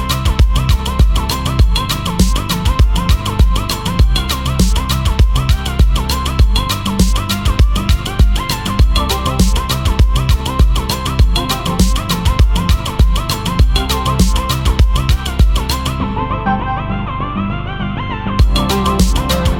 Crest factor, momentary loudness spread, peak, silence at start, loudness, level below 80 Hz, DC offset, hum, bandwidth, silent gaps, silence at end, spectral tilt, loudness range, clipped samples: 12 dB; 4 LU; 0 dBFS; 0 s; -15 LUFS; -14 dBFS; under 0.1%; none; 17.5 kHz; none; 0 s; -5 dB/octave; 2 LU; under 0.1%